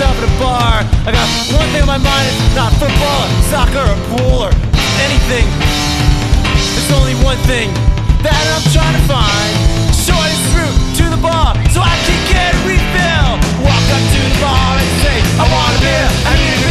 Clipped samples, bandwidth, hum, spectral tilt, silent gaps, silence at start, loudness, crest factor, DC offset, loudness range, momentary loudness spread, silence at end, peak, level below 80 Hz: under 0.1%; 14 kHz; none; -4.5 dB/octave; none; 0 s; -12 LUFS; 10 dB; under 0.1%; 1 LU; 2 LU; 0 s; 0 dBFS; -14 dBFS